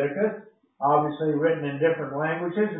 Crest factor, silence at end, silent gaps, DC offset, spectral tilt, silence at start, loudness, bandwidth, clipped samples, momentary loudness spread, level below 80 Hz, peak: 16 dB; 0 s; none; under 0.1%; -11.5 dB/octave; 0 s; -25 LUFS; 3.9 kHz; under 0.1%; 5 LU; -72 dBFS; -8 dBFS